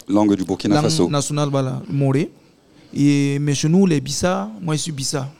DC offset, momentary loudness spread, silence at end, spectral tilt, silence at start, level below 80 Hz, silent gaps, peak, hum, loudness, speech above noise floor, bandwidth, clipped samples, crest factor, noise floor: 0.6%; 7 LU; 0.05 s; -5.5 dB/octave; 0.1 s; -50 dBFS; none; -4 dBFS; none; -19 LUFS; 32 dB; 15.5 kHz; under 0.1%; 16 dB; -50 dBFS